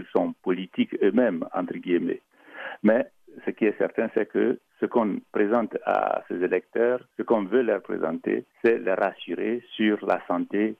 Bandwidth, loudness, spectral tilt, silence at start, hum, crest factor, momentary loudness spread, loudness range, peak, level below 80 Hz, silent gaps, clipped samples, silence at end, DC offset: 5 kHz; -26 LUFS; -8.5 dB/octave; 0 s; none; 16 dB; 7 LU; 1 LU; -10 dBFS; -74 dBFS; none; under 0.1%; 0.05 s; under 0.1%